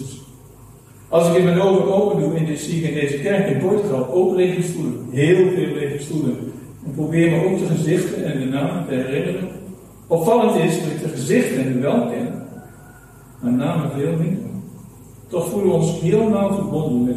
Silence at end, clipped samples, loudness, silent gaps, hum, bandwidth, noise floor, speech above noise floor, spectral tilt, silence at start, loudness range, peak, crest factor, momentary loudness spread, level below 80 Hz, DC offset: 0 s; under 0.1%; -19 LUFS; none; none; 14.5 kHz; -43 dBFS; 25 dB; -7 dB/octave; 0 s; 4 LU; -4 dBFS; 16 dB; 13 LU; -52 dBFS; under 0.1%